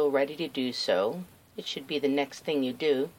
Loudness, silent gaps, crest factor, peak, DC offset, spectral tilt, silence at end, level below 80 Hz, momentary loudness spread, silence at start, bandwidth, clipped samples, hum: -30 LUFS; none; 16 dB; -14 dBFS; under 0.1%; -4.5 dB/octave; 0.05 s; -74 dBFS; 10 LU; 0 s; 17 kHz; under 0.1%; none